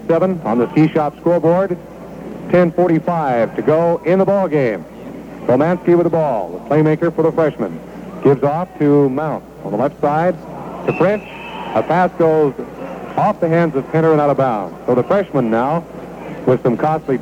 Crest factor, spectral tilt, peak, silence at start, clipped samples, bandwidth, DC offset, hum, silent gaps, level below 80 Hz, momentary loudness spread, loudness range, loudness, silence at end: 14 dB; -9 dB/octave; -2 dBFS; 0 s; under 0.1%; 15.5 kHz; under 0.1%; none; none; -48 dBFS; 14 LU; 2 LU; -16 LUFS; 0 s